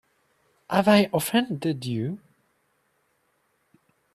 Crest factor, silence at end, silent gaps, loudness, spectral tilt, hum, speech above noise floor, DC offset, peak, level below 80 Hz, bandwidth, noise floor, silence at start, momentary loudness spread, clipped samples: 24 dB; 2 s; none; -24 LUFS; -5.5 dB/octave; none; 47 dB; under 0.1%; -4 dBFS; -66 dBFS; 14 kHz; -70 dBFS; 0.7 s; 12 LU; under 0.1%